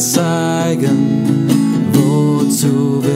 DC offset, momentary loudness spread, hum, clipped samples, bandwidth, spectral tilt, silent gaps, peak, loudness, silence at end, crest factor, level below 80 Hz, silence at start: under 0.1%; 2 LU; none; under 0.1%; 16.5 kHz; -5.5 dB/octave; none; 0 dBFS; -14 LUFS; 0 s; 12 dB; -58 dBFS; 0 s